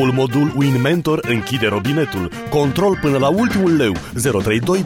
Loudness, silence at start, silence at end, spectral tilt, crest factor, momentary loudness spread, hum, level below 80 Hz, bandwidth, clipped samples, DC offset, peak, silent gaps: -17 LUFS; 0 s; 0 s; -6 dB/octave; 12 dB; 4 LU; none; -42 dBFS; 17 kHz; under 0.1%; under 0.1%; -4 dBFS; none